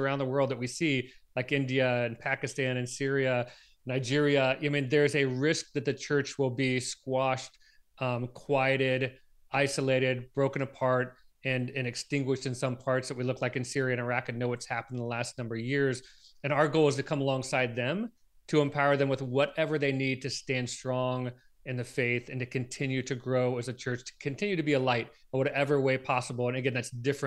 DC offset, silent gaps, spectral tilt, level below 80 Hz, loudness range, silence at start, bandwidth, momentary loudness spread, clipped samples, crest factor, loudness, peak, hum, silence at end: under 0.1%; none; -5.5 dB/octave; -66 dBFS; 4 LU; 0 s; 12.5 kHz; 9 LU; under 0.1%; 20 dB; -30 LUFS; -10 dBFS; none; 0 s